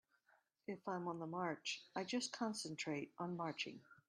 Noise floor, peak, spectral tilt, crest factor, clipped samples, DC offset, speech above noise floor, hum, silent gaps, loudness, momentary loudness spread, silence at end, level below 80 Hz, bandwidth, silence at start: -78 dBFS; -28 dBFS; -4 dB/octave; 18 dB; under 0.1%; under 0.1%; 33 dB; none; none; -45 LUFS; 5 LU; 0.15 s; -88 dBFS; 13 kHz; 0.7 s